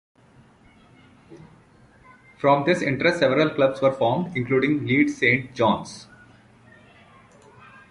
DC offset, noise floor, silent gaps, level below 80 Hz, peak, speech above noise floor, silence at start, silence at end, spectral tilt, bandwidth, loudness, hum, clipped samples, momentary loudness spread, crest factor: under 0.1%; -54 dBFS; none; -60 dBFS; -4 dBFS; 33 dB; 1.3 s; 1.9 s; -6 dB/octave; 11.5 kHz; -21 LUFS; none; under 0.1%; 6 LU; 20 dB